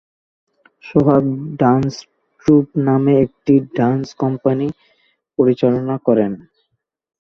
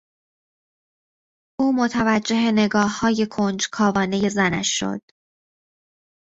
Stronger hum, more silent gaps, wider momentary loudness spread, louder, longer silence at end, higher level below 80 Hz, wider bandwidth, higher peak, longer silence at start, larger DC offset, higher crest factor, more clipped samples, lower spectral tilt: neither; neither; first, 9 LU vs 5 LU; first, -16 LUFS vs -20 LUFS; second, 1.05 s vs 1.4 s; about the same, -52 dBFS vs -56 dBFS; second, 6.8 kHz vs 8 kHz; about the same, -2 dBFS vs -4 dBFS; second, 0.85 s vs 1.6 s; neither; about the same, 16 dB vs 18 dB; neither; first, -9 dB/octave vs -4 dB/octave